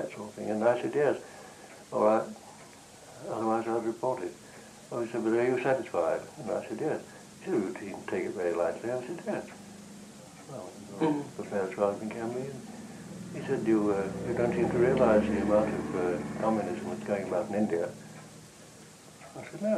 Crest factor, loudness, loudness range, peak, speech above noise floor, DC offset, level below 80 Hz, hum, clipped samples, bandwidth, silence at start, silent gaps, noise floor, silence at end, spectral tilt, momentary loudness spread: 20 dB; -30 LUFS; 7 LU; -12 dBFS; 22 dB; under 0.1%; -60 dBFS; none; under 0.1%; 13.5 kHz; 0 s; none; -51 dBFS; 0 s; -6.5 dB/octave; 21 LU